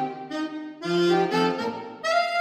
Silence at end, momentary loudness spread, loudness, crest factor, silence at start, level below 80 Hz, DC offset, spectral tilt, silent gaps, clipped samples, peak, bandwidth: 0 s; 10 LU; -25 LUFS; 14 dB; 0 s; -74 dBFS; under 0.1%; -5 dB/octave; none; under 0.1%; -10 dBFS; 14 kHz